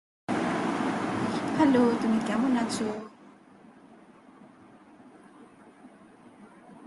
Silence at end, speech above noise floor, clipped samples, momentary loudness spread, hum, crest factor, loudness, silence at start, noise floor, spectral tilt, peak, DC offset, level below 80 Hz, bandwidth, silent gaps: 0 s; 29 dB; under 0.1%; 10 LU; none; 20 dB; -27 LUFS; 0.3 s; -54 dBFS; -5.5 dB/octave; -10 dBFS; under 0.1%; -66 dBFS; 11.5 kHz; none